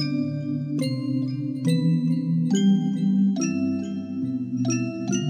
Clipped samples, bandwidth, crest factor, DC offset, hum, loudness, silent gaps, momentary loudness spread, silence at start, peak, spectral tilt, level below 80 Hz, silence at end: under 0.1%; 9.6 kHz; 12 dB; under 0.1%; none; -24 LUFS; none; 7 LU; 0 s; -10 dBFS; -6.5 dB/octave; -76 dBFS; 0 s